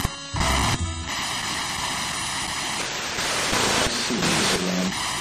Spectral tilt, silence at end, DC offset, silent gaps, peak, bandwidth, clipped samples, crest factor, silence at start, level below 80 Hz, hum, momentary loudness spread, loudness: -2.5 dB/octave; 0 s; under 0.1%; none; -8 dBFS; 14 kHz; under 0.1%; 18 dB; 0 s; -38 dBFS; none; 6 LU; -23 LUFS